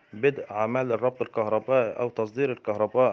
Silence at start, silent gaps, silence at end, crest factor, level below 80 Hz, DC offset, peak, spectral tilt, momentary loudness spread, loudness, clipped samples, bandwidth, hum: 0.15 s; none; 0 s; 16 dB; -74 dBFS; under 0.1%; -8 dBFS; -8 dB/octave; 6 LU; -27 LUFS; under 0.1%; 6.4 kHz; none